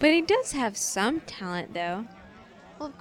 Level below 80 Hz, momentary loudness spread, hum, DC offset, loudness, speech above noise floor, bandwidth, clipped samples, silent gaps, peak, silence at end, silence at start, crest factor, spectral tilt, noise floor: -58 dBFS; 16 LU; none; under 0.1%; -27 LUFS; 23 dB; 17 kHz; under 0.1%; none; -8 dBFS; 0.05 s; 0 s; 20 dB; -3 dB/octave; -50 dBFS